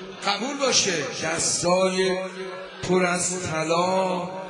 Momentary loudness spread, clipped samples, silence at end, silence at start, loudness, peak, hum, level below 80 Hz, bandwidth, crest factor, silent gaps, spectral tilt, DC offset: 9 LU; under 0.1%; 0 s; 0 s; -23 LUFS; -6 dBFS; none; -60 dBFS; 10.5 kHz; 18 dB; none; -3 dB/octave; under 0.1%